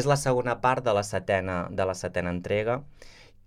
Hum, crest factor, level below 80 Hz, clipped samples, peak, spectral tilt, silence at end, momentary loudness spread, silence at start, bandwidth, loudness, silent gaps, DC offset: none; 18 dB; -52 dBFS; under 0.1%; -10 dBFS; -5.5 dB/octave; 0.25 s; 6 LU; 0 s; 15.5 kHz; -27 LUFS; none; under 0.1%